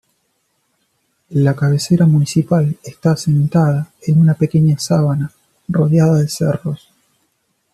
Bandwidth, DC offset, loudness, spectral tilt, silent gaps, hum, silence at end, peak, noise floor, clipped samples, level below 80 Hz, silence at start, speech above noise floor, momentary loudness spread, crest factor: 13 kHz; under 0.1%; -15 LUFS; -7.5 dB/octave; none; none; 1 s; -2 dBFS; -66 dBFS; under 0.1%; -52 dBFS; 1.3 s; 52 dB; 9 LU; 14 dB